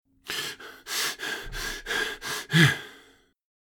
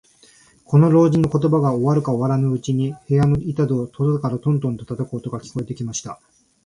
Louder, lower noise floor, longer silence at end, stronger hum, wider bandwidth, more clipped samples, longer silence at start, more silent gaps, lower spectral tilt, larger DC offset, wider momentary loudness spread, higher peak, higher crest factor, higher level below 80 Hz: second, -27 LUFS vs -20 LUFS; first, -58 dBFS vs -52 dBFS; first, 0.65 s vs 0.5 s; neither; first, over 20 kHz vs 10.5 kHz; neither; second, 0.25 s vs 0.7 s; neither; second, -3.5 dB/octave vs -8 dB/octave; neither; about the same, 14 LU vs 13 LU; second, -6 dBFS vs -2 dBFS; first, 24 dB vs 16 dB; about the same, -50 dBFS vs -48 dBFS